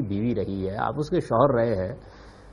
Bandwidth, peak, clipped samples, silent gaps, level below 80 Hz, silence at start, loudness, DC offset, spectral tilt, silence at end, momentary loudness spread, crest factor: 11.5 kHz; -4 dBFS; under 0.1%; none; -48 dBFS; 0 s; -25 LUFS; under 0.1%; -8.5 dB/octave; 0 s; 9 LU; 20 dB